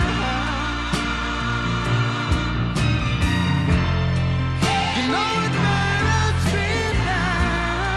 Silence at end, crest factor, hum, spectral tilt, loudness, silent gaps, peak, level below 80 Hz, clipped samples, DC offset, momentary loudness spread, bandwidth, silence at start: 0 s; 16 dB; none; -5.5 dB/octave; -21 LUFS; none; -6 dBFS; -30 dBFS; under 0.1%; under 0.1%; 4 LU; 12.5 kHz; 0 s